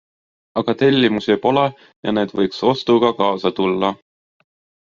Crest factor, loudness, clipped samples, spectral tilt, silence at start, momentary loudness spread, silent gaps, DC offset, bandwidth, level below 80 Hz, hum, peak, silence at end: 16 dB; -18 LUFS; under 0.1%; -4 dB/octave; 0.55 s; 8 LU; 1.96-2.03 s; under 0.1%; 7.2 kHz; -58 dBFS; none; -2 dBFS; 0.9 s